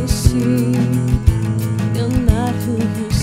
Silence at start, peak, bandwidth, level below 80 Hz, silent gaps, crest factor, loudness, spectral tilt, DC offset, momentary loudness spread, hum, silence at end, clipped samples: 0 s; 0 dBFS; 16 kHz; -24 dBFS; none; 16 dB; -17 LUFS; -6.5 dB/octave; under 0.1%; 4 LU; none; 0 s; under 0.1%